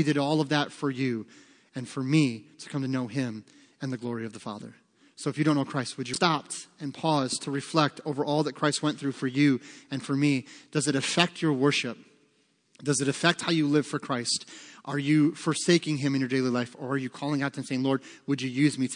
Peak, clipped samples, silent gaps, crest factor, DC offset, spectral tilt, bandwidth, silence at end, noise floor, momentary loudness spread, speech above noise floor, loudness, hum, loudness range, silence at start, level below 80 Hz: -4 dBFS; under 0.1%; none; 24 dB; under 0.1%; -5 dB/octave; 10.5 kHz; 0 s; -68 dBFS; 13 LU; 41 dB; -28 LUFS; none; 5 LU; 0 s; -78 dBFS